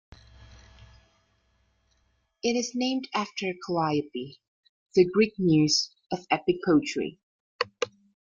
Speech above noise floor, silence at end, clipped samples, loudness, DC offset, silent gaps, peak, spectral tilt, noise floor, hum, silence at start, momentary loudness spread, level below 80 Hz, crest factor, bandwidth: 45 dB; 0.4 s; under 0.1%; -27 LUFS; under 0.1%; 4.48-4.63 s, 4.69-4.86 s, 7.23-7.59 s; -8 dBFS; -4.5 dB/octave; -71 dBFS; none; 2.45 s; 12 LU; -62 dBFS; 20 dB; 7.6 kHz